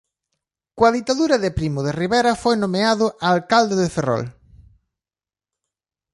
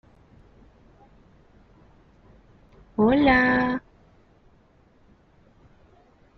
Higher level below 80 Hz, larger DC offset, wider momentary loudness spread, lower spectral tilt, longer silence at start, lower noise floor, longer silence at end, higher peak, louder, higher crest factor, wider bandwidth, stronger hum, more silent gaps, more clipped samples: about the same, -46 dBFS vs -50 dBFS; neither; second, 6 LU vs 14 LU; about the same, -5 dB/octave vs -4 dB/octave; second, 0.75 s vs 3 s; first, under -90 dBFS vs -58 dBFS; second, 1.85 s vs 2.6 s; first, -2 dBFS vs -6 dBFS; about the same, -19 LUFS vs -21 LUFS; about the same, 18 dB vs 22 dB; first, 11.5 kHz vs 6 kHz; neither; neither; neither